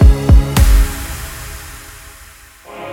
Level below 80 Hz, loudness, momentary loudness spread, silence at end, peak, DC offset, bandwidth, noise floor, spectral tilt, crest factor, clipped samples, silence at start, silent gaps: -14 dBFS; -14 LUFS; 24 LU; 0 s; 0 dBFS; under 0.1%; 17 kHz; -40 dBFS; -5.5 dB/octave; 12 dB; under 0.1%; 0 s; none